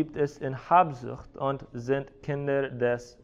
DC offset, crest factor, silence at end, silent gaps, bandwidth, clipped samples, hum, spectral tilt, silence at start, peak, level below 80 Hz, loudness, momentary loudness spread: under 0.1%; 20 dB; 0.15 s; none; 7.8 kHz; under 0.1%; none; -7.5 dB/octave; 0 s; -8 dBFS; -56 dBFS; -28 LUFS; 13 LU